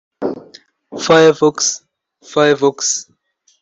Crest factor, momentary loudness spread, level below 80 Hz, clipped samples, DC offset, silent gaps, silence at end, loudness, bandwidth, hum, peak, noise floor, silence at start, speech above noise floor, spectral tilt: 16 dB; 16 LU; -60 dBFS; under 0.1%; under 0.1%; none; 0.6 s; -14 LUFS; 8.4 kHz; none; -2 dBFS; -44 dBFS; 0.2 s; 31 dB; -3 dB/octave